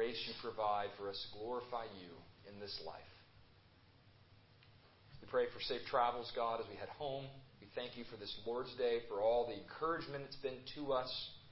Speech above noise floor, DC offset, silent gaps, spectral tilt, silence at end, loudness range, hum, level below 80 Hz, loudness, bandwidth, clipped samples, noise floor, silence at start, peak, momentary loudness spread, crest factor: 25 dB; under 0.1%; none; -2 dB/octave; 0 s; 10 LU; none; -70 dBFS; -42 LUFS; 5.6 kHz; under 0.1%; -67 dBFS; 0 s; -22 dBFS; 16 LU; 22 dB